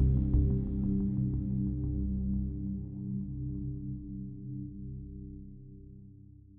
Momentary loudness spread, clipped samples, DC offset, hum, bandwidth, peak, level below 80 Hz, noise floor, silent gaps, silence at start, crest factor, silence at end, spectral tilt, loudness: 21 LU; under 0.1%; under 0.1%; none; 1.4 kHz; -16 dBFS; -38 dBFS; -53 dBFS; none; 0 s; 18 dB; 0 s; -15 dB/octave; -34 LUFS